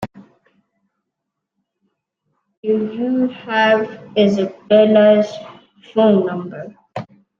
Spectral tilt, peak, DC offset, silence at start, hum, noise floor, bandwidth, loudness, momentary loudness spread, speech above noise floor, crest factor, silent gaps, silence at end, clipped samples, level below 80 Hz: -7 dB/octave; -2 dBFS; under 0.1%; 0 s; none; -79 dBFS; 7.2 kHz; -16 LUFS; 20 LU; 64 dB; 16 dB; 2.57-2.63 s; 0.35 s; under 0.1%; -62 dBFS